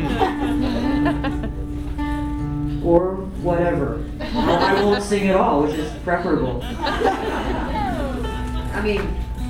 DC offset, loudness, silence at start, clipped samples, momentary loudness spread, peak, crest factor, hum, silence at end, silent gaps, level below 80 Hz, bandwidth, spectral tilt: under 0.1%; -21 LUFS; 0 s; under 0.1%; 9 LU; -4 dBFS; 18 dB; none; 0 s; none; -30 dBFS; 15.5 kHz; -6.5 dB/octave